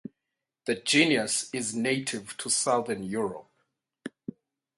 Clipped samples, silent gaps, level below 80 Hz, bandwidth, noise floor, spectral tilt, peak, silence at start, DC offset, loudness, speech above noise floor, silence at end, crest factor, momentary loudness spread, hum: under 0.1%; none; -70 dBFS; 11.5 kHz; -86 dBFS; -2.5 dB/octave; -8 dBFS; 0.65 s; under 0.1%; -27 LUFS; 58 dB; 0.7 s; 22 dB; 22 LU; none